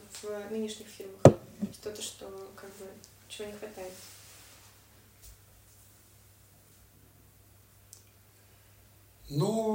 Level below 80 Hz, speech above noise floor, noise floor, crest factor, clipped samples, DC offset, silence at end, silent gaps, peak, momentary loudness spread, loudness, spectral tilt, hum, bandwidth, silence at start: -60 dBFS; 29 dB; -59 dBFS; 34 dB; under 0.1%; under 0.1%; 0 s; none; 0 dBFS; 32 LU; -30 LUFS; -6.5 dB/octave; none; 16 kHz; 0.1 s